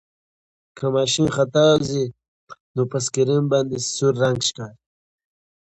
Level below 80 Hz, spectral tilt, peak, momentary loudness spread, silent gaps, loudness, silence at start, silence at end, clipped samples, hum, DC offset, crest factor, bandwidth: -56 dBFS; -4.5 dB/octave; -4 dBFS; 11 LU; 2.28-2.47 s, 2.60-2.74 s; -20 LUFS; 0.75 s; 1.05 s; under 0.1%; none; under 0.1%; 18 dB; 9 kHz